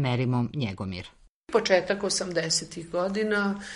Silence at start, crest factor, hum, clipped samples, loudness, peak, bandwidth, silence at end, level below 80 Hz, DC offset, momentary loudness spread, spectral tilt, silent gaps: 0 s; 20 dB; none; under 0.1%; -27 LUFS; -6 dBFS; 11.5 kHz; 0 s; -58 dBFS; under 0.1%; 11 LU; -4.5 dB/octave; 1.29-1.42 s